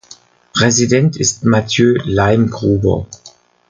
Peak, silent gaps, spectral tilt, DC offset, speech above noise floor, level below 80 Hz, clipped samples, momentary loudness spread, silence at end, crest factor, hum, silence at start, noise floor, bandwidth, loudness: 0 dBFS; none; -4.5 dB/octave; under 0.1%; 30 dB; -38 dBFS; under 0.1%; 6 LU; 0.4 s; 14 dB; none; 0.55 s; -43 dBFS; 10 kHz; -14 LUFS